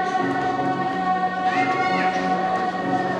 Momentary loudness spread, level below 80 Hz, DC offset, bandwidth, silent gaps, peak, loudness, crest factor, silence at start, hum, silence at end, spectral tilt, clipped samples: 3 LU; -60 dBFS; under 0.1%; 9.6 kHz; none; -8 dBFS; -22 LUFS; 14 dB; 0 s; none; 0 s; -5.5 dB/octave; under 0.1%